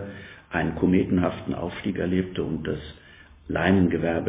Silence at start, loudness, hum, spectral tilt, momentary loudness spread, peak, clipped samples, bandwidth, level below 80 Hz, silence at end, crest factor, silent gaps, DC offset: 0 s; -25 LUFS; none; -11.5 dB/octave; 12 LU; -8 dBFS; under 0.1%; 4 kHz; -44 dBFS; 0 s; 18 dB; none; under 0.1%